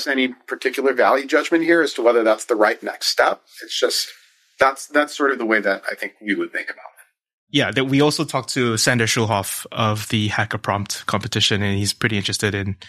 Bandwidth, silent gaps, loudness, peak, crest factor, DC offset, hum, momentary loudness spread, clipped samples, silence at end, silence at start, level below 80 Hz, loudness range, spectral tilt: 15.5 kHz; 7.33-7.47 s; -19 LUFS; -2 dBFS; 18 dB; under 0.1%; none; 7 LU; under 0.1%; 0 s; 0 s; -58 dBFS; 4 LU; -4 dB/octave